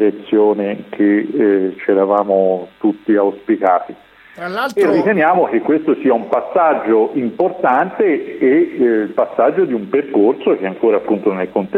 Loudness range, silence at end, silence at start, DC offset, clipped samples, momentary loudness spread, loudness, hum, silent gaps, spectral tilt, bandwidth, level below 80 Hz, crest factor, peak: 1 LU; 0 s; 0 s; under 0.1%; under 0.1%; 5 LU; -15 LUFS; none; none; -8 dB/octave; 8.6 kHz; -62 dBFS; 14 dB; -2 dBFS